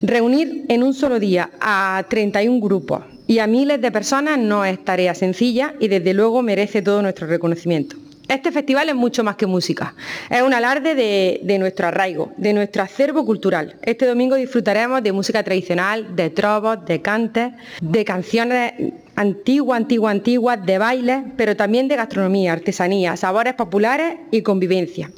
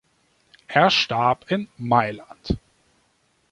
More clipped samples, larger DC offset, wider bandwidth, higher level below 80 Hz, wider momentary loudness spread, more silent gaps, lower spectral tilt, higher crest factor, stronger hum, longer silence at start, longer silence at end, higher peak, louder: neither; neither; first, 18.5 kHz vs 11 kHz; second, -62 dBFS vs -46 dBFS; second, 5 LU vs 12 LU; neither; about the same, -5.5 dB/octave vs -5 dB/octave; second, 12 dB vs 20 dB; neither; second, 0 s vs 0.7 s; second, 0.05 s vs 0.95 s; second, -6 dBFS vs -2 dBFS; first, -18 LUFS vs -21 LUFS